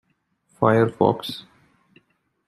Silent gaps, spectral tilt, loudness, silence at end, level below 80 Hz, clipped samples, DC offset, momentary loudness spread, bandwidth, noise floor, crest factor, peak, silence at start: none; -7.5 dB/octave; -21 LUFS; 1.05 s; -64 dBFS; under 0.1%; under 0.1%; 15 LU; 15 kHz; -68 dBFS; 22 dB; -2 dBFS; 0.6 s